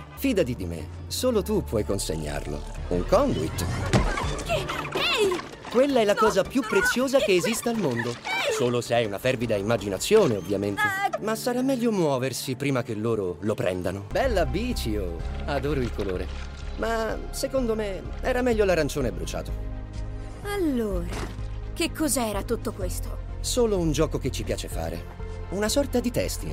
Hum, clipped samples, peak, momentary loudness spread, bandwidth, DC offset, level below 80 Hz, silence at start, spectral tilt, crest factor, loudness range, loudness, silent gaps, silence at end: none; under 0.1%; -6 dBFS; 11 LU; 16 kHz; under 0.1%; -36 dBFS; 0 s; -5 dB/octave; 20 dB; 5 LU; -26 LUFS; none; 0 s